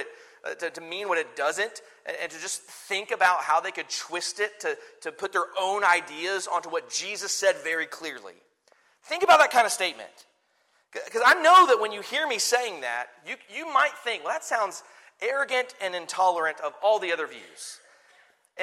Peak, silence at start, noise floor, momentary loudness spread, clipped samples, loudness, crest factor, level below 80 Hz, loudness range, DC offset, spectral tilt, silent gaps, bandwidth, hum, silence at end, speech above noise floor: -4 dBFS; 0 s; -68 dBFS; 17 LU; under 0.1%; -25 LUFS; 22 dB; -80 dBFS; 6 LU; under 0.1%; 0 dB/octave; none; 16 kHz; none; 0 s; 42 dB